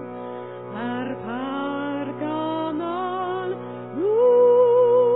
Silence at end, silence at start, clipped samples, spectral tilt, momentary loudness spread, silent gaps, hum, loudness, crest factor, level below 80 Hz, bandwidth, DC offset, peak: 0 s; 0 s; under 0.1%; -10.5 dB/octave; 17 LU; none; none; -22 LUFS; 14 dB; -74 dBFS; 4.1 kHz; 0.1%; -8 dBFS